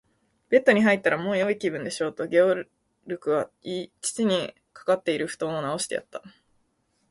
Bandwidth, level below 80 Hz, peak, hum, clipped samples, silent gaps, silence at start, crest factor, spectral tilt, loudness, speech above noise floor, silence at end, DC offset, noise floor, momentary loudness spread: 11.5 kHz; -68 dBFS; -4 dBFS; none; under 0.1%; none; 0.5 s; 22 dB; -4.5 dB/octave; -25 LUFS; 46 dB; 0.8 s; under 0.1%; -71 dBFS; 14 LU